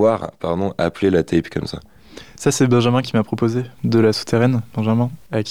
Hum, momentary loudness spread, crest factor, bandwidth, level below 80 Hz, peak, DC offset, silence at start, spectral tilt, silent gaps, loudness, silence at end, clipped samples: none; 9 LU; 14 dB; 14.5 kHz; -48 dBFS; -4 dBFS; 0.5%; 0 s; -6 dB/octave; none; -19 LUFS; 0 s; under 0.1%